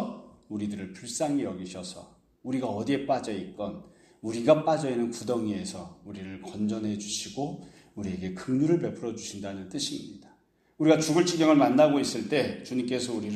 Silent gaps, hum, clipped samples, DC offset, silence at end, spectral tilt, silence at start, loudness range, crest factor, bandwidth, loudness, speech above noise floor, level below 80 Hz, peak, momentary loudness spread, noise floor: none; none; under 0.1%; under 0.1%; 0 s; -5 dB/octave; 0 s; 8 LU; 22 dB; 13.5 kHz; -28 LUFS; 35 dB; -66 dBFS; -8 dBFS; 18 LU; -63 dBFS